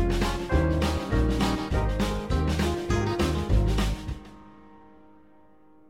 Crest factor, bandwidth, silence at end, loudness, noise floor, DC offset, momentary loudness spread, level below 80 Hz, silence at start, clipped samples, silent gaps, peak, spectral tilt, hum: 16 dB; 16 kHz; 1.4 s; -27 LUFS; -57 dBFS; 0.2%; 4 LU; -30 dBFS; 0 s; under 0.1%; none; -10 dBFS; -6 dB/octave; none